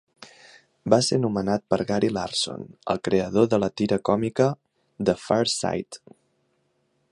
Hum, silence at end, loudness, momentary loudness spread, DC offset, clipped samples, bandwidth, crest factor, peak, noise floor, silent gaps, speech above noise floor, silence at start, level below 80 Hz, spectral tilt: none; 1.15 s; -24 LUFS; 10 LU; under 0.1%; under 0.1%; 11.5 kHz; 22 dB; -2 dBFS; -70 dBFS; none; 47 dB; 0.2 s; -56 dBFS; -5 dB/octave